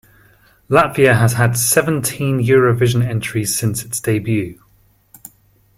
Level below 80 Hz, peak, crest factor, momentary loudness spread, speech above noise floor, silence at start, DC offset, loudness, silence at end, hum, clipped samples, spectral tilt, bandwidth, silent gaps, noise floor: -48 dBFS; 0 dBFS; 16 dB; 8 LU; 39 dB; 0.7 s; under 0.1%; -15 LUFS; 1.25 s; none; under 0.1%; -5 dB/octave; 16.5 kHz; none; -54 dBFS